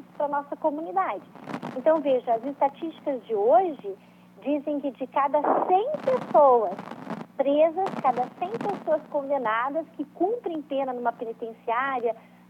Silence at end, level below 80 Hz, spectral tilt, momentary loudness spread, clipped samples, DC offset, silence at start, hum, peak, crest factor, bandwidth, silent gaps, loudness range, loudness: 0.3 s; -80 dBFS; -7 dB/octave; 14 LU; under 0.1%; under 0.1%; 0.15 s; 60 Hz at -55 dBFS; -8 dBFS; 18 dB; 8.2 kHz; none; 5 LU; -26 LUFS